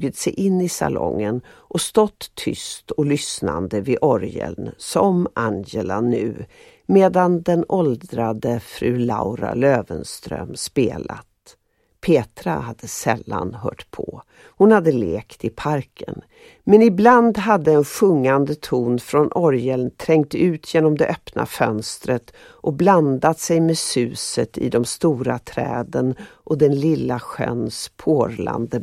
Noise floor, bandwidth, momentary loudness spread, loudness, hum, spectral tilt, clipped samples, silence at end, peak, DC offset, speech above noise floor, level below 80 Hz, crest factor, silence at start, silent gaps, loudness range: -62 dBFS; 15.5 kHz; 14 LU; -20 LUFS; none; -6 dB/octave; under 0.1%; 0 s; 0 dBFS; under 0.1%; 43 dB; -50 dBFS; 20 dB; 0 s; none; 6 LU